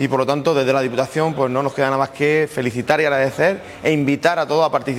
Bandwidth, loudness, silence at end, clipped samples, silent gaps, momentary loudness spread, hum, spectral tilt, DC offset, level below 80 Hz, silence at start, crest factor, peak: 16 kHz; -18 LUFS; 0 s; under 0.1%; none; 3 LU; none; -6 dB/octave; under 0.1%; -58 dBFS; 0 s; 18 dB; 0 dBFS